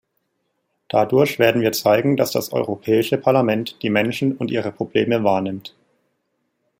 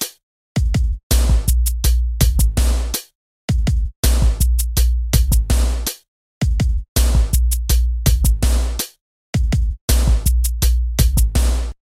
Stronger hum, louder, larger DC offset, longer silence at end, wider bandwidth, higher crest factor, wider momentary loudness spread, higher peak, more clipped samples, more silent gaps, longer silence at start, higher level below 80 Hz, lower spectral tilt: neither; about the same, -19 LUFS vs -19 LUFS; neither; first, 1.1 s vs 0.2 s; about the same, 16.5 kHz vs 16 kHz; about the same, 18 dB vs 16 dB; about the same, 7 LU vs 7 LU; about the same, -2 dBFS vs -2 dBFS; neither; second, none vs 0.23-0.55 s, 1.03-1.10 s, 3.15-3.48 s, 3.96-4.03 s, 6.08-6.41 s, 6.88-6.95 s, 9.01-9.33 s, 9.81-9.88 s; first, 0.95 s vs 0 s; second, -62 dBFS vs -16 dBFS; about the same, -5.5 dB/octave vs -4.5 dB/octave